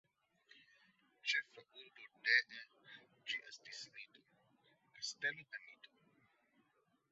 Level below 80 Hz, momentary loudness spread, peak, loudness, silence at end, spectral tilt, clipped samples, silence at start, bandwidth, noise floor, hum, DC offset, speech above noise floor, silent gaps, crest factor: under -90 dBFS; 25 LU; -18 dBFS; -40 LUFS; 1.25 s; 3 dB/octave; under 0.1%; 1.25 s; 7.6 kHz; -79 dBFS; none; under 0.1%; 37 dB; none; 28 dB